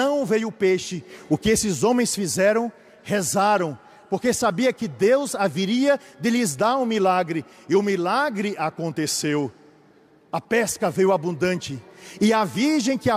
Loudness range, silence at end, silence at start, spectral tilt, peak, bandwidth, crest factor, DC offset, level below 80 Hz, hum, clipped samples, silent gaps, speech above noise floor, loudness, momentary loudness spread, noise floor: 3 LU; 0 s; 0 s; -4.5 dB/octave; -8 dBFS; 15.5 kHz; 14 dB; under 0.1%; -56 dBFS; none; under 0.1%; none; 33 dB; -22 LUFS; 10 LU; -55 dBFS